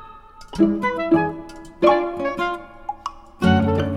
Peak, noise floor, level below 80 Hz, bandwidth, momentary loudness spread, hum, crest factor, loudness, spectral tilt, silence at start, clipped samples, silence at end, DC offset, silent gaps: -4 dBFS; -42 dBFS; -44 dBFS; 11.5 kHz; 17 LU; none; 18 dB; -21 LUFS; -7.5 dB/octave; 0 s; under 0.1%; 0 s; under 0.1%; none